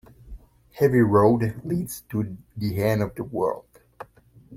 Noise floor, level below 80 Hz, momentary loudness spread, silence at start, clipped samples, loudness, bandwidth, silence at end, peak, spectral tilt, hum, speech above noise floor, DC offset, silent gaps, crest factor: -53 dBFS; -50 dBFS; 24 LU; 0.25 s; under 0.1%; -23 LUFS; 16.5 kHz; 0 s; -4 dBFS; -7.5 dB/octave; none; 30 dB; under 0.1%; none; 20 dB